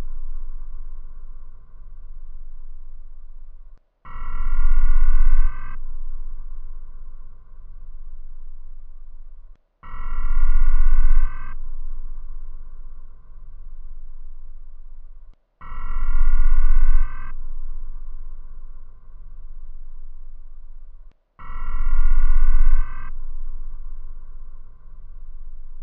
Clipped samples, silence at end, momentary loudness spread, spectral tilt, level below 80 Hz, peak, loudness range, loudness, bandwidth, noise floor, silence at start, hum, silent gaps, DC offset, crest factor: under 0.1%; 0 s; 25 LU; -9.5 dB/octave; -18 dBFS; -2 dBFS; 17 LU; -28 LUFS; 2.3 kHz; -41 dBFS; 0 s; none; none; under 0.1%; 14 dB